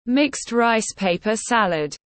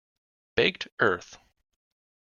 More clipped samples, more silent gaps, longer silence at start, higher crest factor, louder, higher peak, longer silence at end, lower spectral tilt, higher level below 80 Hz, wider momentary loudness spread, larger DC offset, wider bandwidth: neither; second, none vs 0.92-0.97 s; second, 0.05 s vs 0.55 s; second, 16 dB vs 24 dB; first, -21 LUFS vs -27 LUFS; about the same, -4 dBFS vs -6 dBFS; second, 0.2 s vs 0.85 s; about the same, -3.5 dB/octave vs -4.5 dB/octave; first, -56 dBFS vs -62 dBFS; second, 4 LU vs 7 LU; neither; first, 8.8 kHz vs 7.2 kHz